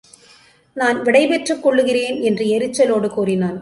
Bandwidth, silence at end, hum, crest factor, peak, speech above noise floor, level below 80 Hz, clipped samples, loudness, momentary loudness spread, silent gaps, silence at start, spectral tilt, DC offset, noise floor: 11.5 kHz; 0 s; none; 16 dB; -2 dBFS; 34 dB; -60 dBFS; under 0.1%; -17 LUFS; 5 LU; none; 0.75 s; -5 dB/octave; under 0.1%; -50 dBFS